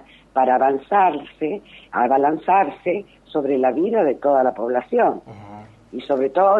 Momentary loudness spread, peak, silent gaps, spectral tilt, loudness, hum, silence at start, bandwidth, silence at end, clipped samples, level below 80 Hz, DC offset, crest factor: 11 LU; -6 dBFS; none; -8 dB/octave; -20 LUFS; none; 0.35 s; 4.4 kHz; 0 s; under 0.1%; -60 dBFS; under 0.1%; 14 dB